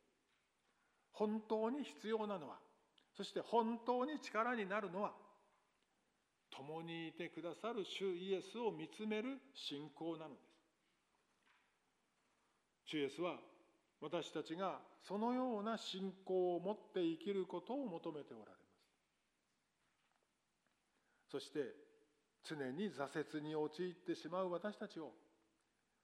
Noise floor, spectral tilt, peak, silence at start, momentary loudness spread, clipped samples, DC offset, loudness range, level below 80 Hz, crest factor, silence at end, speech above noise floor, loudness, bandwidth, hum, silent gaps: -85 dBFS; -5.5 dB/octave; -24 dBFS; 1.15 s; 14 LU; under 0.1%; under 0.1%; 11 LU; under -90 dBFS; 22 dB; 0.9 s; 41 dB; -45 LUFS; 13 kHz; none; none